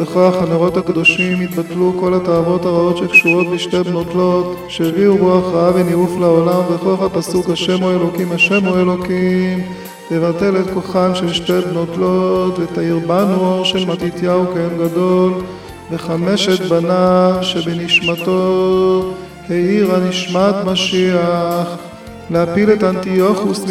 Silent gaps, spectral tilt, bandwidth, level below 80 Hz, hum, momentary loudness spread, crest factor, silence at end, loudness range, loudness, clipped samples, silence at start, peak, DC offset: none; -6 dB/octave; 15 kHz; -46 dBFS; none; 7 LU; 14 dB; 0 s; 3 LU; -14 LUFS; under 0.1%; 0 s; 0 dBFS; 0.2%